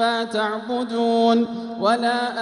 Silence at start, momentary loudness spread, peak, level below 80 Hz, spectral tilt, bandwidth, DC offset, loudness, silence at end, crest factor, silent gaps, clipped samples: 0 s; 7 LU; -6 dBFS; -68 dBFS; -4.5 dB/octave; 11.5 kHz; under 0.1%; -21 LUFS; 0 s; 16 dB; none; under 0.1%